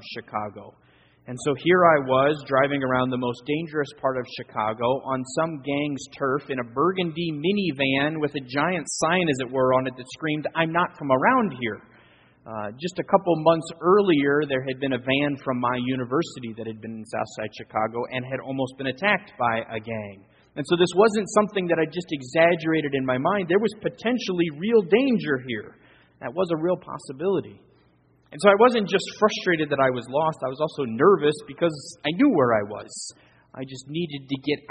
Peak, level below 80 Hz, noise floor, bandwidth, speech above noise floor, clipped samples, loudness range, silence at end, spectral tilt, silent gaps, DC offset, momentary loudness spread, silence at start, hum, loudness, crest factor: -2 dBFS; -62 dBFS; -60 dBFS; 8.8 kHz; 37 dB; under 0.1%; 5 LU; 0.1 s; -5.5 dB/octave; none; under 0.1%; 13 LU; 0 s; none; -24 LUFS; 22 dB